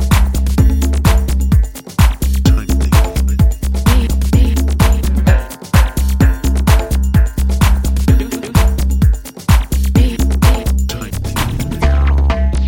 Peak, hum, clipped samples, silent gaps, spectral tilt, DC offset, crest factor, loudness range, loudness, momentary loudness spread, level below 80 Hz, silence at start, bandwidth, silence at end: 0 dBFS; none; under 0.1%; none; -6 dB/octave; under 0.1%; 12 dB; 1 LU; -14 LUFS; 4 LU; -14 dBFS; 0 s; 17 kHz; 0 s